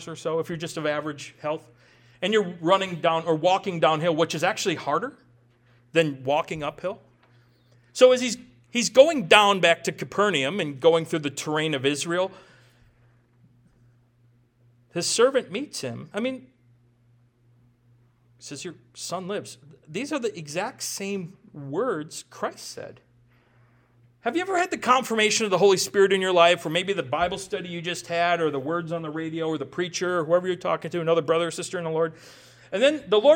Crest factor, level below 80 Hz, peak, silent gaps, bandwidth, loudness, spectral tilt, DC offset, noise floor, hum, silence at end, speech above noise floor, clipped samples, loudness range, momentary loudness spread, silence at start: 26 dB; -66 dBFS; 0 dBFS; none; 17.5 kHz; -24 LUFS; -3.5 dB/octave; under 0.1%; -61 dBFS; none; 0 s; 37 dB; under 0.1%; 13 LU; 15 LU; 0 s